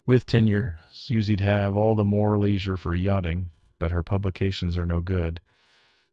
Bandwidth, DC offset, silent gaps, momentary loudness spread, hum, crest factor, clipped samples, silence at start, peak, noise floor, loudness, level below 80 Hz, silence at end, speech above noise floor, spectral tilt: 7.4 kHz; under 0.1%; none; 11 LU; none; 18 dB; under 0.1%; 0.05 s; -6 dBFS; -62 dBFS; -25 LUFS; -44 dBFS; 0.75 s; 39 dB; -8.5 dB/octave